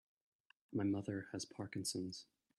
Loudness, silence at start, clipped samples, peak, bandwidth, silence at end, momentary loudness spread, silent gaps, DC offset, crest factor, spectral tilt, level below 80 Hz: -43 LUFS; 0.7 s; under 0.1%; -28 dBFS; 13 kHz; 0.35 s; 8 LU; none; under 0.1%; 16 dB; -4.5 dB/octave; -80 dBFS